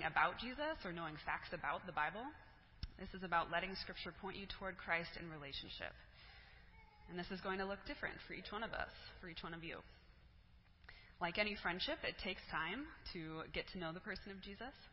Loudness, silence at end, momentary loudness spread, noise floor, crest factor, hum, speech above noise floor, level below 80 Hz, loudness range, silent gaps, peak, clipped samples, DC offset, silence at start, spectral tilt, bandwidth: -45 LUFS; 0 s; 21 LU; -66 dBFS; 26 dB; none; 21 dB; -62 dBFS; 5 LU; none; -20 dBFS; under 0.1%; under 0.1%; 0 s; -2 dB/octave; 5.6 kHz